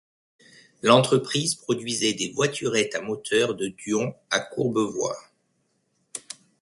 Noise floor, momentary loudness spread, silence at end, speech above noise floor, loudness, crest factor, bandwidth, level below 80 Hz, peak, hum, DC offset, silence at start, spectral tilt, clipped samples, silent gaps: -71 dBFS; 18 LU; 0.3 s; 47 dB; -24 LUFS; 24 dB; 11.5 kHz; -66 dBFS; -2 dBFS; none; under 0.1%; 0.85 s; -3.5 dB/octave; under 0.1%; none